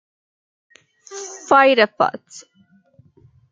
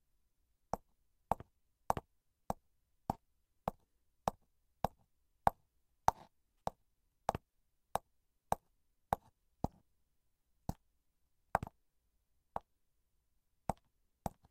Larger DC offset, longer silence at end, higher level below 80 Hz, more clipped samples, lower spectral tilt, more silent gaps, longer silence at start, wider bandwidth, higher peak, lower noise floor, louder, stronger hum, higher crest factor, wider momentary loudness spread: neither; first, 1.1 s vs 0.2 s; second, -68 dBFS vs -60 dBFS; neither; second, -3 dB/octave vs -5.5 dB/octave; neither; first, 1.1 s vs 0.75 s; second, 9 kHz vs 16 kHz; first, -2 dBFS vs -12 dBFS; second, -54 dBFS vs -80 dBFS; first, -15 LUFS vs -43 LUFS; neither; second, 20 dB vs 34 dB; first, 23 LU vs 12 LU